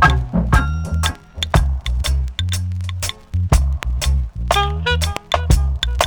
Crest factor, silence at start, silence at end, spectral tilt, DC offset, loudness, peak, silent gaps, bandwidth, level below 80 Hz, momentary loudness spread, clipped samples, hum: 14 dB; 0 s; 0 s; -4.5 dB/octave; under 0.1%; -19 LUFS; -2 dBFS; none; 20 kHz; -20 dBFS; 6 LU; under 0.1%; none